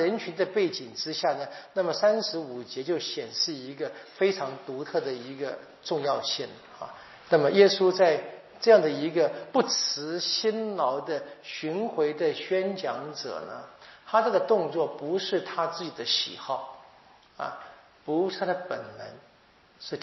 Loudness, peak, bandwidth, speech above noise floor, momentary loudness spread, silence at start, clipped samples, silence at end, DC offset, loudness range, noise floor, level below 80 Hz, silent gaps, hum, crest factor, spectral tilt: -27 LUFS; -4 dBFS; 6.2 kHz; 32 dB; 16 LU; 0 s; under 0.1%; 0 s; under 0.1%; 8 LU; -59 dBFS; -78 dBFS; none; none; 24 dB; -2.5 dB/octave